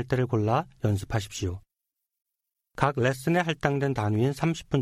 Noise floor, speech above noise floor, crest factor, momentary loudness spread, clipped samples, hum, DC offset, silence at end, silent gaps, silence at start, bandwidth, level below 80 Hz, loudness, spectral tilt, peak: -85 dBFS; 59 dB; 20 dB; 8 LU; under 0.1%; none; under 0.1%; 0 s; none; 0 s; 15 kHz; -52 dBFS; -27 LUFS; -6.5 dB/octave; -8 dBFS